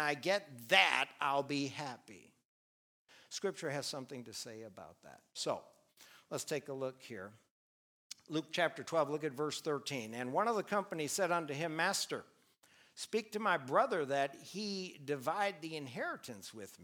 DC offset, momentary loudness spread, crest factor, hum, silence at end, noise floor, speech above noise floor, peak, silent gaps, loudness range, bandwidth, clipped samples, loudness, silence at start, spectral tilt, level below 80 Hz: under 0.1%; 16 LU; 28 dB; none; 0 s; -68 dBFS; 31 dB; -10 dBFS; 2.45-3.05 s, 7.51-8.10 s; 9 LU; over 20 kHz; under 0.1%; -37 LUFS; 0 s; -3 dB/octave; -88 dBFS